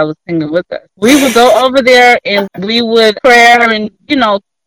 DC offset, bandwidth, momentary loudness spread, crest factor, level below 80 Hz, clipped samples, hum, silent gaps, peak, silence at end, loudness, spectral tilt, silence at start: under 0.1%; 18 kHz; 11 LU; 8 dB; -46 dBFS; 2%; none; none; 0 dBFS; 0.25 s; -8 LUFS; -3.5 dB/octave; 0 s